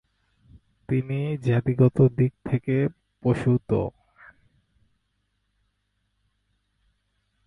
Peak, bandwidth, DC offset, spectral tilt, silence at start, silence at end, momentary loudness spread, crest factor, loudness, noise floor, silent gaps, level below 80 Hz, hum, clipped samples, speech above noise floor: -8 dBFS; 4.3 kHz; under 0.1%; -10 dB/octave; 0.9 s; 3.6 s; 9 LU; 20 dB; -24 LUFS; -74 dBFS; none; -54 dBFS; 50 Hz at -55 dBFS; under 0.1%; 51 dB